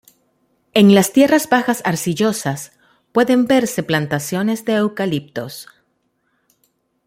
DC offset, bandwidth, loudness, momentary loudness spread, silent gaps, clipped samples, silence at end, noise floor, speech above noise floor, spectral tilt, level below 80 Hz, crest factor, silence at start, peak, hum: under 0.1%; 16.5 kHz; -16 LUFS; 17 LU; none; under 0.1%; 1.45 s; -67 dBFS; 51 dB; -5 dB/octave; -58 dBFS; 16 dB; 0.75 s; 0 dBFS; none